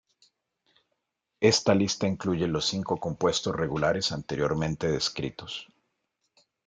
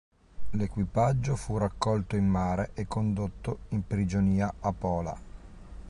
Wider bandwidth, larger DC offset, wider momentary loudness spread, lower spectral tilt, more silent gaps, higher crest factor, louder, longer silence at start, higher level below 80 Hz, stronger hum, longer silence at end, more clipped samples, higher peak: second, 9.4 kHz vs 11.5 kHz; neither; about the same, 10 LU vs 8 LU; second, -4.5 dB/octave vs -7.5 dB/octave; neither; first, 22 dB vs 16 dB; first, -27 LUFS vs -30 LUFS; first, 1.4 s vs 0.15 s; second, -56 dBFS vs -44 dBFS; neither; first, 1 s vs 0 s; neither; first, -8 dBFS vs -14 dBFS